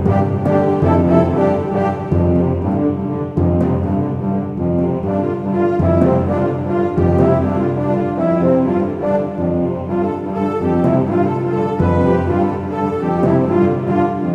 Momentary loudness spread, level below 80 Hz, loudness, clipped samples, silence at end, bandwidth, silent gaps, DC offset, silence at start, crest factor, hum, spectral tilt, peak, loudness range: 5 LU; -38 dBFS; -16 LUFS; under 0.1%; 0 s; 7 kHz; none; under 0.1%; 0 s; 14 dB; none; -10.5 dB/octave; 0 dBFS; 2 LU